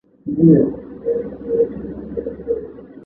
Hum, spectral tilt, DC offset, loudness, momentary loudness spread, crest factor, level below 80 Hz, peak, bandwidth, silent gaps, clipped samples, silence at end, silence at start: none; -13.5 dB/octave; under 0.1%; -19 LUFS; 15 LU; 18 dB; -46 dBFS; -2 dBFS; 2.2 kHz; none; under 0.1%; 0 s; 0.25 s